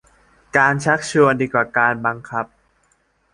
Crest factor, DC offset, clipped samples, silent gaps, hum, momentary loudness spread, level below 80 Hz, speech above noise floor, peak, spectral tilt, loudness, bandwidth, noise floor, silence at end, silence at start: 18 dB; under 0.1%; under 0.1%; none; 50 Hz at -50 dBFS; 11 LU; -56 dBFS; 45 dB; -2 dBFS; -5.5 dB/octave; -18 LUFS; 11.5 kHz; -62 dBFS; 0.9 s; 0.55 s